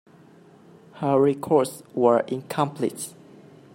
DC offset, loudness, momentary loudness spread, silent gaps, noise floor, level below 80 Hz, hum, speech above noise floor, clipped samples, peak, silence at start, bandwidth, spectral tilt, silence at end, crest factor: under 0.1%; -23 LUFS; 9 LU; none; -51 dBFS; -70 dBFS; none; 29 dB; under 0.1%; -6 dBFS; 0.95 s; 16 kHz; -6 dB/octave; 0.65 s; 20 dB